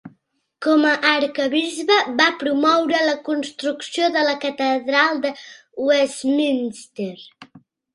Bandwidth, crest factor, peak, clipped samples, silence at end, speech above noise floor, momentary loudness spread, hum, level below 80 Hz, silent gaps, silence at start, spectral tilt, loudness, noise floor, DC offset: 11.5 kHz; 20 dB; 0 dBFS; under 0.1%; 0.35 s; 44 dB; 13 LU; none; -70 dBFS; none; 0.05 s; -3 dB/octave; -19 LUFS; -64 dBFS; under 0.1%